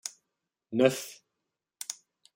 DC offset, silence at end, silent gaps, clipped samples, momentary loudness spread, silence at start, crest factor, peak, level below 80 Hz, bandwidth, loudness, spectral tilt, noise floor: under 0.1%; 0.4 s; none; under 0.1%; 18 LU; 0.05 s; 24 dB; -10 dBFS; -80 dBFS; 16.5 kHz; -30 LUFS; -4 dB/octave; -86 dBFS